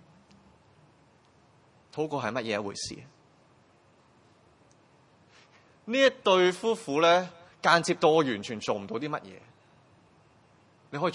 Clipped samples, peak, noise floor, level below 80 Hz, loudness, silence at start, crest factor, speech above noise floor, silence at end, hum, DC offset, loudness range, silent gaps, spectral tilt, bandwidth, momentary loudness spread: under 0.1%; -6 dBFS; -62 dBFS; -74 dBFS; -27 LUFS; 1.95 s; 24 dB; 35 dB; 0 s; none; under 0.1%; 12 LU; none; -4 dB/octave; 11.5 kHz; 17 LU